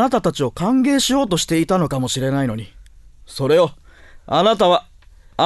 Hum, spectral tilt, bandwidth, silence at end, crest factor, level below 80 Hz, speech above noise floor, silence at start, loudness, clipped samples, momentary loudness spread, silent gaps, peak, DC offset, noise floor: none; -5 dB/octave; 12.5 kHz; 0 s; 16 dB; -44 dBFS; 26 dB; 0 s; -18 LUFS; under 0.1%; 9 LU; none; -2 dBFS; under 0.1%; -43 dBFS